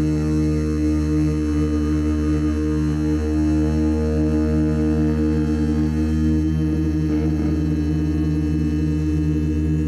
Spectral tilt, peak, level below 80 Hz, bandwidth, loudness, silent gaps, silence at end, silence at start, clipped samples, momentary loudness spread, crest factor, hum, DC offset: -8.5 dB/octave; -12 dBFS; -28 dBFS; 11.5 kHz; -20 LUFS; none; 0 s; 0 s; under 0.1%; 2 LU; 8 dB; none; under 0.1%